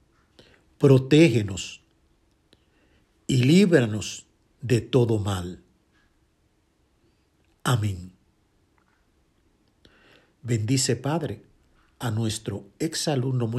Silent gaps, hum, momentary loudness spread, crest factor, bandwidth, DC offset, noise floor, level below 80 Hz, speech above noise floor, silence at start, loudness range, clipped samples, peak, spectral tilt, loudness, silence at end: none; none; 21 LU; 20 dB; 13 kHz; under 0.1%; -67 dBFS; -60 dBFS; 44 dB; 0.8 s; 11 LU; under 0.1%; -4 dBFS; -6 dB/octave; -23 LUFS; 0 s